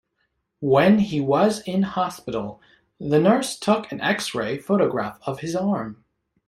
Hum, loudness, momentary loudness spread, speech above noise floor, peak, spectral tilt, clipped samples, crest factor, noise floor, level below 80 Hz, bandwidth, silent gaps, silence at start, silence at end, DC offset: none; -22 LUFS; 12 LU; 52 dB; -4 dBFS; -6 dB/octave; under 0.1%; 18 dB; -73 dBFS; -58 dBFS; 13.5 kHz; none; 0.6 s; 0.55 s; under 0.1%